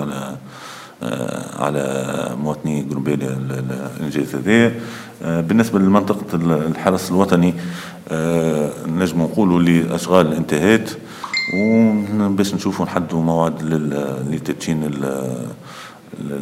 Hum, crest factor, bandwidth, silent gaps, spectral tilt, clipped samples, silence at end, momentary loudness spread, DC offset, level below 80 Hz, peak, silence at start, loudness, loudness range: none; 18 dB; 16 kHz; none; -6.5 dB/octave; under 0.1%; 0 s; 14 LU; under 0.1%; -54 dBFS; 0 dBFS; 0 s; -19 LUFS; 6 LU